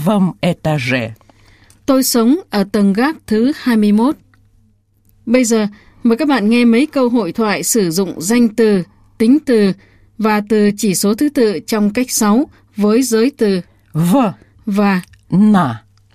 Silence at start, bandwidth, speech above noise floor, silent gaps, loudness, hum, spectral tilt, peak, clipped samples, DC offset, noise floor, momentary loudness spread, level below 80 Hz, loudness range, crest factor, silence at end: 0 s; 15.5 kHz; 41 dB; none; -14 LUFS; none; -5 dB/octave; 0 dBFS; under 0.1%; 0.2%; -54 dBFS; 8 LU; -50 dBFS; 2 LU; 14 dB; 0.35 s